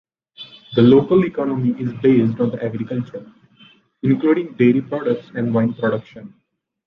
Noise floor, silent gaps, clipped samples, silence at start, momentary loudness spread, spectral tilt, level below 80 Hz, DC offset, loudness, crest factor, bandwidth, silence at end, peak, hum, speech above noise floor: -51 dBFS; none; under 0.1%; 0.4 s; 14 LU; -10 dB/octave; -56 dBFS; under 0.1%; -18 LUFS; 16 dB; 5.2 kHz; 0.6 s; -2 dBFS; none; 34 dB